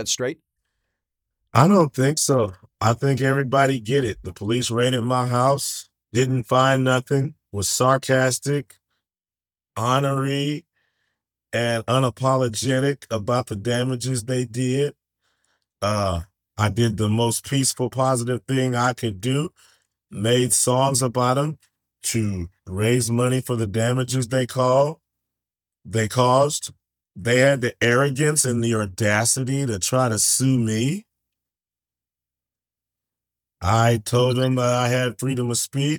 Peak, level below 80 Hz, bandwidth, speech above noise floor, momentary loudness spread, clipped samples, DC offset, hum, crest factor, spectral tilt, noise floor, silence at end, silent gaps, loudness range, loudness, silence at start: 0 dBFS; -56 dBFS; 19 kHz; over 69 dB; 10 LU; under 0.1%; under 0.1%; none; 22 dB; -4.5 dB/octave; under -90 dBFS; 0 s; none; 5 LU; -21 LUFS; 0 s